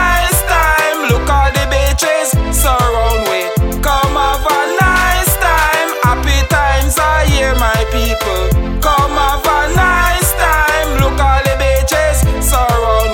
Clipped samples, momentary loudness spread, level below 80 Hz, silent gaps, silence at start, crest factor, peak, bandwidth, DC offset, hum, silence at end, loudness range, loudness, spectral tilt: under 0.1%; 3 LU; -16 dBFS; none; 0 s; 12 dB; 0 dBFS; 19 kHz; under 0.1%; none; 0 s; 1 LU; -12 LUFS; -4 dB/octave